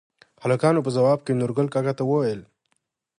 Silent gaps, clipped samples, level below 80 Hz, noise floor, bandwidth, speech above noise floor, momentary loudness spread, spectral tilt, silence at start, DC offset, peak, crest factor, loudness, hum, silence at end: none; under 0.1%; -66 dBFS; -74 dBFS; 11 kHz; 52 dB; 7 LU; -7.5 dB/octave; 0.4 s; under 0.1%; -6 dBFS; 18 dB; -23 LUFS; none; 0.75 s